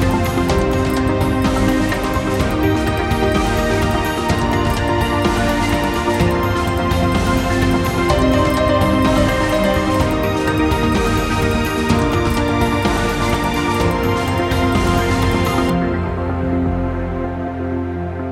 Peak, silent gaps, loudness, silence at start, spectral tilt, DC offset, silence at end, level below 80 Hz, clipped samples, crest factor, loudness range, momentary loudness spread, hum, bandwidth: -2 dBFS; none; -17 LUFS; 0 s; -6 dB/octave; under 0.1%; 0 s; -26 dBFS; under 0.1%; 14 dB; 2 LU; 5 LU; none; 16 kHz